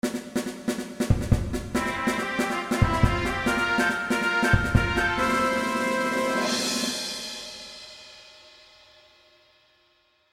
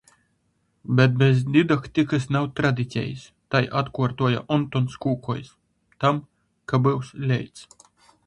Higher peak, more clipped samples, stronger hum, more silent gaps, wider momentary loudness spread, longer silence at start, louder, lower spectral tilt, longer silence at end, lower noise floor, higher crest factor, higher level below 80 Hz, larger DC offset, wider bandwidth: about the same, -4 dBFS vs -2 dBFS; neither; neither; neither; about the same, 13 LU vs 11 LU; second, 0.05 s vs 0.9 s; about the same, -25 LUFS vs -23 LUFS; second, -4.5 dB/octave vs -7.5 dB/octave; first, 1.85 s vs 0.65 s; second, -65 dBFS vs -69 dBFS; about the same, 22 dB vs 22 dB; first, -36 dBFS vs -56 dBFS; neither; first, 16 kHz vs 10.5 kHz